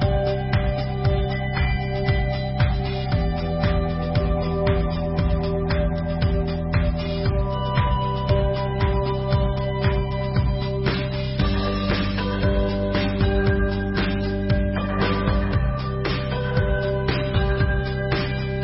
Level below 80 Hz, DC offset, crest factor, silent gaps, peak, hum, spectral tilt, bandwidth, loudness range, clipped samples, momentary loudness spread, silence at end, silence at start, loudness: -28 dBFS; under 0.1%; 14 dB; none; -8 dBFS; none; -11 dB/octave; 5.8 kHz; 1 LU; under 0.1%; 3 LU; 0 s; 0 s; -23 LUFS